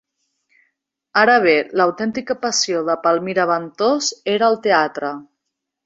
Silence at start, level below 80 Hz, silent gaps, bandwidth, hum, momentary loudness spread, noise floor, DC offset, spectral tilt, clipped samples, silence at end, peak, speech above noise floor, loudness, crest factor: 1.15 s; -64 dBFS; none; 7.8 kHz; none; 9 LU; -79 dBFS; under 0.1%; -3 dB/octave; under 0.1%; 0.65 s; 0 dBFS; 61 dB; -18 LUFS; 18 dB